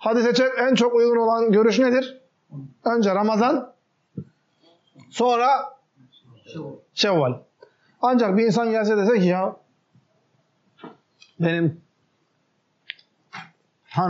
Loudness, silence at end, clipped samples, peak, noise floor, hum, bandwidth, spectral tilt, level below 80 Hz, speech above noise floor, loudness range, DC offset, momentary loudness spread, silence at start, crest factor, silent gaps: -20 LUFS; 0 s; under 0.1%; -8 dBFS; -69 dBFS; none; 7.6 kHz; -4.5 dB/octave; -76 dBFS; 49 dB; 10 LU; under 0.1%; 22 LU; 0 s; 14 dB; none